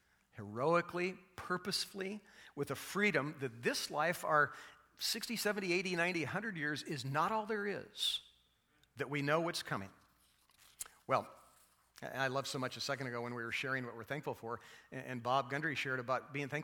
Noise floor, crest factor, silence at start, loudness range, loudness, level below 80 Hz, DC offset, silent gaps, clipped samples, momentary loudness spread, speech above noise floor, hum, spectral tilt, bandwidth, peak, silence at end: -74 dBFS; 22 dB; 0.35 s; 5 LU; -38 LUFS; -76 dBFS; under 0.1%; none; under 0.1%; 14 LU; 36 dB; none; -4 dB/octave; 19.5 kHz; -18 dBFS; 0 s